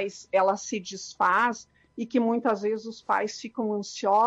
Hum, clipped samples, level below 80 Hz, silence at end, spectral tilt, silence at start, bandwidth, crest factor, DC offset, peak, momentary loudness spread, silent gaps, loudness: none; under 0.1%; -72 dBFS; 0 s; -4 dB/octave; 0 s; 9 kHz; 14 dB; under 0.1%; -12 dBFS; 11 LU; none; -27 LUFS